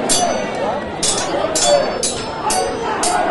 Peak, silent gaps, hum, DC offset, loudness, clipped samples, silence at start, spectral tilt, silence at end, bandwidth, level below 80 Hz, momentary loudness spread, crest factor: -2 dBFS; none; none; under 0.1%; -17 LUFS; under 0.1%; 0 s; -2 dB/octave; 0 s; 12 kHz; -42 dBFS; 7 LU; 16 dB